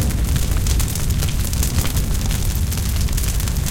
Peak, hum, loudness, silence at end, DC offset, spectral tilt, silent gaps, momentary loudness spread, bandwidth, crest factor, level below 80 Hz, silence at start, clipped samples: -6 dBFS; none; -21 LUFS; 0 s; 1%; -4.5 dB/octave; none; 2 LU; 17.5 kHz; 12 dB; -20 dBFS; 0 s; under 0.1%